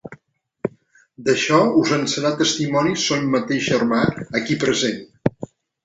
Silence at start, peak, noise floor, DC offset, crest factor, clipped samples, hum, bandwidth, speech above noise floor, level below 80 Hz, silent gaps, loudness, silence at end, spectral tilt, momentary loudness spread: 0.05 s; -2 dBFS; -55 dBFS; under 0.1%; 18 dB; under 0.1%; none; 8.2 kHz; 37 dB; -56 dBFS; none; -20 LUFS; 0.4 s; -4.5 dB/octave; 14 LU